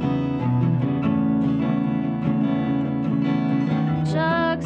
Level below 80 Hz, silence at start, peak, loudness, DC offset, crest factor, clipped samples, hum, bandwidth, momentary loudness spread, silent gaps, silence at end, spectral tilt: -50 dBFS; 0 s; -10 dBFS; -22 LUFS; under 0.1%; 12 dB; under 0.1%; none; 8.2 kHz; 2 LU; none; 0 s; -9 dB/octave